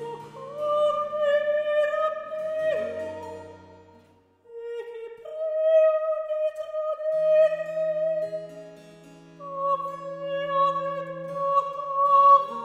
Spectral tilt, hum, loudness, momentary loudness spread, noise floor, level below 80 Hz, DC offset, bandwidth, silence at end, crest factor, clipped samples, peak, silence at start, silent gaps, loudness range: -5 dB/octave; none; -24 LUFS; 19 LU; -58 dBFS; -74 dBFS; under 0.1%; 8.8 kHz; 0 s; 18 dB; under 0.1%; -8 dBFS; 0 s; none; 6 LU